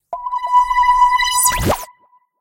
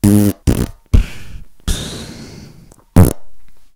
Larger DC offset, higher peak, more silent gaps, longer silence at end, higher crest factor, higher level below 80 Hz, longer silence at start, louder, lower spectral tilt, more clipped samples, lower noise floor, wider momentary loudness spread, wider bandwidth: neither; about the same, -2 dBFS vs 0 dBFS; neither; first, 0.55 s vs 0.1 s; about the same, 14 dB vs 16 dB; second, -34 dBFS vs -22 dBFS; about the same, 0.1 s vs 0.05 s; about the same, -14 LUFS vs -16 LUFS; second, -2 dB/octave vs -6.5 dB/octave; neither; first, -53 dBFS vs -41 dBFS; second, 11 LU vs 23 LU; second, 17 kHz vs 19 kHz